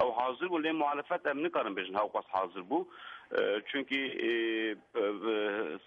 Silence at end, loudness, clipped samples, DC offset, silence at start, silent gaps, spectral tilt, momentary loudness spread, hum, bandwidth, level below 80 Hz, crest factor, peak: 0.1 s; -33 LUFS; under 0.1%; under 0.1%; 0 s; none; -6 dB/octave; 4 LU; none; 5.6 kHz; -80 dBFS; 16 dB; -18 dBFS